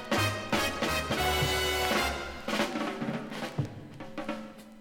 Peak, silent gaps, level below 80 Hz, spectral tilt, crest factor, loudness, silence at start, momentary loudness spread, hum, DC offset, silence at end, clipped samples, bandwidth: -14 dBFS; none; -46 dBFS; -4 dB/octave; 18 dB; -30 LUFS; 0 s; 12 LU; none; under 0.1%; 0 s; under 0.1%; 17.5 kHz